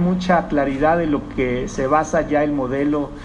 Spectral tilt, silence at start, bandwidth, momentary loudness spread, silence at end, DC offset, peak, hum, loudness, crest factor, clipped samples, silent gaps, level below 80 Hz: -6.5 dB/octave; 0 s; 10 kHz; 5 LU; 0 s; under 0.1%; -4 dBFS; none; -19 LUFS; 16 dB; under 0.1%; none; -36 dBFS